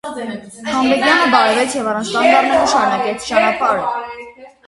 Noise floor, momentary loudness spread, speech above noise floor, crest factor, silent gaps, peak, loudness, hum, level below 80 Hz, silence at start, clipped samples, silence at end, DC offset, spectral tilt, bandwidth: -36 dBFS; 15 LU; 22 dB; 16 dB; none; 0 dBFS; -14 LUFS; none; -52 dBFS; 0.05 s; under 0.1%; 0.2 s; under 0.1%; -3 dB/octave; 11.5 kHz